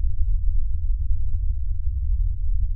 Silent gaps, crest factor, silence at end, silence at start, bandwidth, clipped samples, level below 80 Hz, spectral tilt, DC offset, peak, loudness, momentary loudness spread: none; 12 dB; 0 s; 0 s; 0.2 kHz; under 0.1%; -22 dBFS; -25.5 dB/octave; under 0.1%; -8 dBFS; -28 LUFS; 2 LU